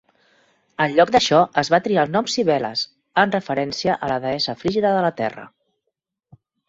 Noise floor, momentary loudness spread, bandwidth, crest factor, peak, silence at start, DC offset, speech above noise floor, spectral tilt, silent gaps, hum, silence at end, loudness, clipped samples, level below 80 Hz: -79 dBFS; 9 LU; 8 kHz; 20 dB; -2 dBFS; 0.8 s; under 0.1%; 59 dB; -4.5 dB/octave; none; none; 1.2 s; -20 LUFS; under 0.1%; -58 dBFS